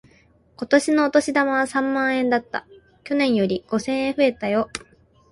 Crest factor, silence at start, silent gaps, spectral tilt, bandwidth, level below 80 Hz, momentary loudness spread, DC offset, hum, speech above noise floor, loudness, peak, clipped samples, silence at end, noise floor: 18 dB; 0.6 s; none; -4.5 dB/octave; 11.5 kHz; -58 dBFS; 11 LU; under 0.1%; none; 36 dB; -21 LUFS; -4 dBFS; under 0.1%; 0.55 s; -56 dBFS